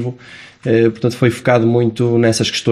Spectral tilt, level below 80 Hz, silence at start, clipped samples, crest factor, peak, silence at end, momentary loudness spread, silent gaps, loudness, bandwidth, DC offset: -6 dB/octave; -52 dBFS; 0 s; under 0.1%; 14 dB; 0 dBFS; 0 s; 11 LU; none; -14 LUFS; 13.5 kHz; under 0.1%